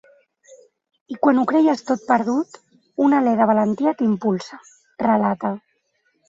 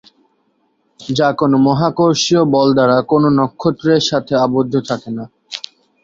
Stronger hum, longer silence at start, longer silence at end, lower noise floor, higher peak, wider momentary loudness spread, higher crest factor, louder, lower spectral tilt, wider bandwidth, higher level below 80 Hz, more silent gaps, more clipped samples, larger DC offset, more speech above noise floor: neither; about the same, 1.1 s vs 1 s; first, 0.7 s vs 0.45 s; first, -67 dBFS vs -62 dBFS; about the same, -4 dBFS vs -2 dBFS; about the same, 14 LU vs 16 LU; about the same, 18 dB vs 14 dB; second, -19 LUFS vs -14 LUFS; first, -7 dB/octave vs -5.5 dB/octave; about the same, 7.8 kHz vs 7.8 kHz; second, -66 dBFS vs -52 dBFS; neither; neither; neither; about the same, 49 dB vs 48 dB